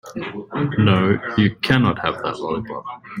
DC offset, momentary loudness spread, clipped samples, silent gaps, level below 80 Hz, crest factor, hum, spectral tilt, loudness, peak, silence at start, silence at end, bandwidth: under 0.1%; 14 LU; under 0.1%; none; -50 dBFS; 18 dB; none; -7.5 dB/octave; -20 LUFS; -2 dBFS; 0.05 s; 0 s; 15 kHz